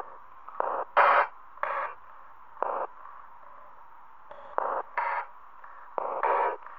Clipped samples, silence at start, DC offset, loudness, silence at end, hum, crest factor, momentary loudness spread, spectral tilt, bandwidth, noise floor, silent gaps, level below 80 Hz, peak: under 0.1%; 0 s; 0.4%; -29 LUFS; 0 s; none; 24 dB; 26 LU; -4.5 dB/octave; 5.8 kHz; -53 dBFS; none; -74 dBFS; -8 dBFS